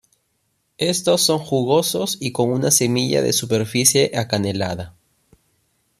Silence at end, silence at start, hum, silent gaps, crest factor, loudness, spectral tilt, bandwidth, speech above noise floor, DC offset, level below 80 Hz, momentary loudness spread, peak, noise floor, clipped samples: 1.1 s; 0.8 s; none; none; 20 dB; -18 LUFS; -3.5 dB/octave; 14.5 kHz; 50 dB; under 0.1%; -56 dBFS; 8 LU; 0 dBFS; -69 dBFS; under 0.1%